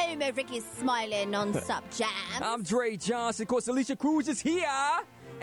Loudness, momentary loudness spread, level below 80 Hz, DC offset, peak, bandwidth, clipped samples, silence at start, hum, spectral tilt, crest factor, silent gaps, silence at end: -30 LUFS; 5 LU; -66 dBFS; under 0.1%; -18 dBFS; 18.5 kHz; under 0.1%; 0 s; none; -3.5 dB/octave; 12 dB; none; 0 s